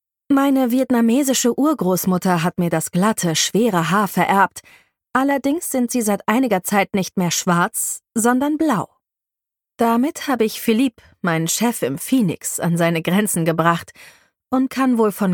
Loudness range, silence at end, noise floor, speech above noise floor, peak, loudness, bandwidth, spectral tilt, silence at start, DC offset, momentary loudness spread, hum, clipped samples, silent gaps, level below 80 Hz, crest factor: 3 LU; 0 s; -86 dBFS; 68 dB; -2 dBFS; -18 LUFS; 19 kHz; -4.5 dB/octave; 0.3 s; under 0.1%; 5 LU; none; under 0.1%; none; -60 dBFS; 18 dB